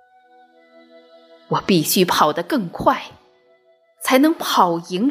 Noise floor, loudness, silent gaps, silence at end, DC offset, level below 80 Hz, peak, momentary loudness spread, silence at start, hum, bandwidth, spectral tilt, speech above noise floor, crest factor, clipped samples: -57 dBFS; -18 LUFS; none; 0 s; under 0.1%; -56 dBFS; 0 dBFS; 9 LU; 1.5 s; none; 16 kHz; -4 dB/octave; 39 dB; 20 dB; under 0.1%